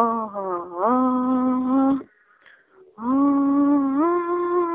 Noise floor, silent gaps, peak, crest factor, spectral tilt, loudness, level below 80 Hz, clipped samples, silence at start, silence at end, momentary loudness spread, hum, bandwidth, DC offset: -54 dBFS; none; -6 dBFS; 14 dB; -7 dB/octave; -21 LUFS; -62 dBFS; under 0.1%; 0 s; 0 s; 9 LU; none; 3.7 kHz; under 0.1%